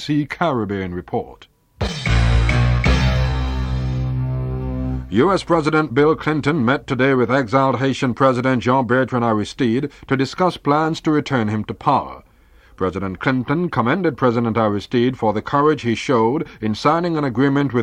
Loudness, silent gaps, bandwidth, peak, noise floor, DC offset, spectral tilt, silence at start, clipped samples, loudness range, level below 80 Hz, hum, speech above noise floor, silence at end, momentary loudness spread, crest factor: -19 LUFS; none; 10 kHz; -2 dBFS; -49 dBFS; under 0.1%; -7 dB/octave; 0 s; under 0.1%; 3 LU; -28 dBFS; none; 31 dB; 0 s; 8 LU; 16 dB